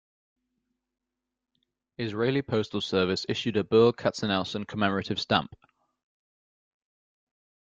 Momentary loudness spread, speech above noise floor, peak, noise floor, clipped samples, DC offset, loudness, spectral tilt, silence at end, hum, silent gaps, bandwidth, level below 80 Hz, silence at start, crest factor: 9 LU; 60 dB; -8 dBFS; -86 dBFS; under 0.1%; under 0.1%; -27 LUFS; -5.5 dB/octave; 2.25 s; none; none; 7.8 kHz; -64 dBFS; 2 s; 22 dB